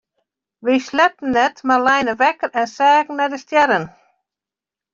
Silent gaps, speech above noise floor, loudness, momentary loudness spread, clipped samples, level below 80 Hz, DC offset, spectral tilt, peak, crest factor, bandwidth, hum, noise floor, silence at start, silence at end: none; 72 dB; -17 LUFS; 7 LU; under 0.1%; -60 dBFS; under 0.1%; -4 dB/octave; -2 dBFS; 16 dB; 7.6 kHz; none; -88 dBFS; 0.65 s; 1.05 s